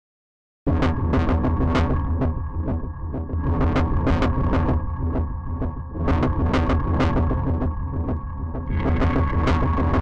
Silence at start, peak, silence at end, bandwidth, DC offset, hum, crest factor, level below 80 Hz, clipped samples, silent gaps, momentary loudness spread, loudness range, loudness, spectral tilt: 0.65 s; -12 dBFS; 0 s; 7 kHz; under 0.1%; none; 10 dB; -26 dBFS; under 0.1%; none; 8 LU; 1 LU; -23 LUFS; -8.5 dB/octave